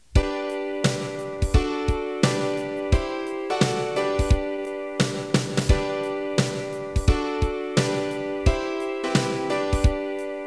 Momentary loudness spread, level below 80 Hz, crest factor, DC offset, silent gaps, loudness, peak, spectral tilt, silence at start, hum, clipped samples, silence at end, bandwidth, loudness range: 6 LU; -30 dBFS; 18 dB; 0.1%; none; -25 LUFS; -6 dBFS; -5.5 dB/octave; 0.15 s; none; under 0.1%; 0 s; 11 kHz; 1 LU